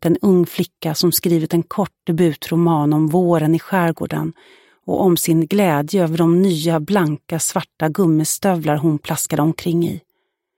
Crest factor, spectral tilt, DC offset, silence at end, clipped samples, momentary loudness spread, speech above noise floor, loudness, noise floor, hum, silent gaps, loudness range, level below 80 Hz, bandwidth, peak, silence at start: 14 dB; -5.5 dB/octave; under 0.1%; 0.6 s; under 0.1%; 8 LU; 54 dB; -17 LUFS; -71 dBFS; none; none; 1 LU; -56 dBFS; 17 kHz; -4 dBFS; 0 s